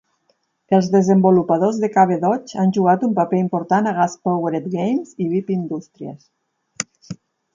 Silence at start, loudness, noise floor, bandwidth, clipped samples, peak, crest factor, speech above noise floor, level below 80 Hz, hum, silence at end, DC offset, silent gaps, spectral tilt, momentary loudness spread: 0.7 s; -18 LUFS; -66 dBFS; 7.6 kHz; under 0.1%; -2 dBFS; 16 dB; 48 dB; -64 dBFS; none; 0.4 s; under 0.1%; none; -7 dB/octave; 14 LU